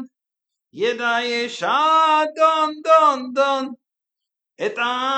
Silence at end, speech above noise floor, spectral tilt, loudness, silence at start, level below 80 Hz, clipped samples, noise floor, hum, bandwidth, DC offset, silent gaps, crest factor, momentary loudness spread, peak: 0 s; 66 dB; -2.5 dB/octave; -18 LUFS; 0 s; -86 dBFS; under 0.1%; -85 dBFS; none; 8.8 kHz; under 0.1%; none; 16 dB; 10 LU; -4 dBFS